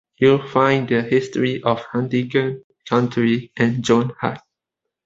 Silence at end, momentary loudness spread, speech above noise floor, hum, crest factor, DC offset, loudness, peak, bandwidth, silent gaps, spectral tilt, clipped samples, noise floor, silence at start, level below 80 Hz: 0.65 s; 9 LU; 64 dB; none; 18 dB; under 0.1%; -19 LUFS; -2 dBFS; 7.8 kHz; 2.64-2.70 s; -6.5 dB/octave; under 0.1%; -82 dBFS; 0.2 s; -56 dBFS